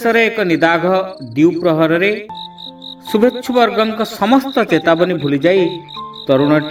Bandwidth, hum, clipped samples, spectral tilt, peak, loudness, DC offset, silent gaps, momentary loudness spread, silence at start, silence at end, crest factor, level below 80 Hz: 16.5 kHz; none; under 0.1%; -6 dB/octave; 0 dBFS; -14 LUFS; under 0.1%; none; 15 LU; 0 s; 0 s; 14 dB; -56 dBFS